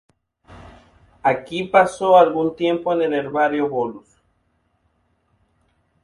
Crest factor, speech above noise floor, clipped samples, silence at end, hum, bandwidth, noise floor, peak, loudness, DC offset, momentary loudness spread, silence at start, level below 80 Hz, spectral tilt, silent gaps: 20 dB; 48 dB; under 0.1%; 2.05 s; none; 11.5 kHz; -66 dBFS; 0 dBFS; -19 LUFS; under 0.1%; 9 LU; 0.5 s; -58 dBFS; -5.5 dB/octave; none